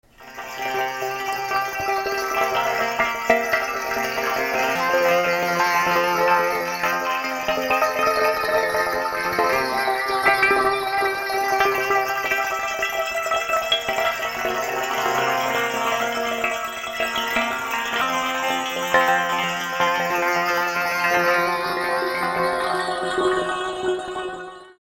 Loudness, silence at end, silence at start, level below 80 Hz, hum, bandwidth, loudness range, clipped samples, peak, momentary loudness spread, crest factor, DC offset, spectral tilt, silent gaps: -21 LUFS; 0.15 s; 0.2 s; -54 dBFS; none; 16.5 kHz; 3 LU; under 0.1%; -2 dBFS; 6 LU; 20 dB; under 0.1%; -2.5 dB/octave; none